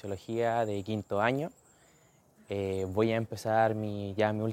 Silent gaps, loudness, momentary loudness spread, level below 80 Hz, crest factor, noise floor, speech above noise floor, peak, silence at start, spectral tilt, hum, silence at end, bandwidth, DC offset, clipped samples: none; -31 LUFS; 8 LU; -68 dBFS; 20 dB; -63 dBFS; 33 dB; -12 dBFS; 0.05 s; -6.5 dB/octave; none; 0 s; 16 kHz; under 0.1%; under 0.1%